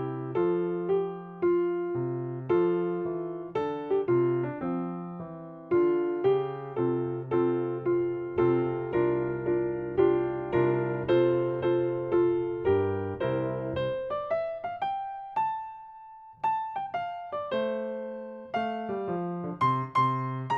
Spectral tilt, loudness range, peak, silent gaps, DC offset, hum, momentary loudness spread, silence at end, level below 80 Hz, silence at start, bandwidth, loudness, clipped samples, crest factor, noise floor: -9.5 dB/octave; 6 LU; -12 dBFS; none; under 0.1%; none; 9 LU; 0 s; -62 dBFS; 0 s; 4.6 kHz; -29 LUFS; under 0.1%; 16 dB; -48 dBFS